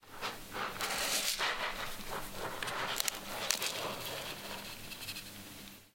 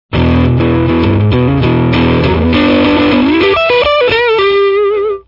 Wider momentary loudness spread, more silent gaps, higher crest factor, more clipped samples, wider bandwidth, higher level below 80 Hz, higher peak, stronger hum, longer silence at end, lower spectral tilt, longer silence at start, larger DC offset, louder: first, 12 LU vs 2 LU; neither; first, 34 dB vs 10 dB; neither; first, 17 kHz vs 5.8 kHz; second, -58 dBFS vs -28 dBFS; second, -6 dBFS vs 0 dBFS; neither; about the same, 0.05 s vs 0.05 s; second, -1 dB/octave vs -8.5 dB/octave; about the same, 0 s vs 0.1 s; neither; second, -37 LUFS vs -10 LUFS